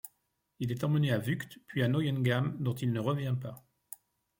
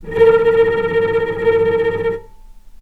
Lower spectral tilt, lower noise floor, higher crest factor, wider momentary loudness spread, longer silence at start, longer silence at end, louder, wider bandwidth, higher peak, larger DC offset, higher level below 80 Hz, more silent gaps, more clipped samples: about the same, -7 dB/octave vs -7 dB/octave; first, -78 dBFS vs -38 dBFS; about the same, 16 dB vs 16 dB; first, 20 LU vs 9 LU; about the same, 0.05 s vs 0 s; first, 0.8 s vs 0.05 s; second, -32 LUFS vs -15 LUFS; first, 17 kHz vs 4.6 kHz; second, -16 dBFS vs 0 dBFS; neither; second, -68 dBFS vs -40 dBFS; neither; neither